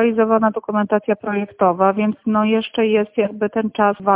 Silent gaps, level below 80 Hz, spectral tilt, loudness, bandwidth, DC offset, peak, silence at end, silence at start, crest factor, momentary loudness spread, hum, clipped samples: none; -60 dBFS; -10.5 dB/octave; -18 LUFS; 3.8 kHz; under 0.1%; -2 dBFS; 0 s; 0 s; 14 dB; 5 LU; none; under 0.1%